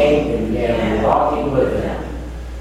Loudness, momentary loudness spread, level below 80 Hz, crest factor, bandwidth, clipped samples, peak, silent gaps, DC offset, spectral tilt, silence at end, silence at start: -18 LUFS; 13 LU; -30 dBFS; 16 dB; 14 kHz; under 0.1%; -2 dBFS; none; under 0.1%; -7 dB/octave; 0 s; 0 s